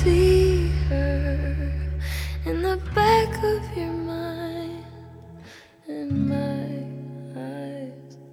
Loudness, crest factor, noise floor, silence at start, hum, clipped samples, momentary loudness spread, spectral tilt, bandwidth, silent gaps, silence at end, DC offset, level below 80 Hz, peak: -24 LUFS; 18 dB; -47 dBFS; 0 s; none; under 0.1%; 21 LU; -7 dB/octave; 15.5 kHz; none; 0 s; under 0.1%; -30 dBFS; -6 dBFS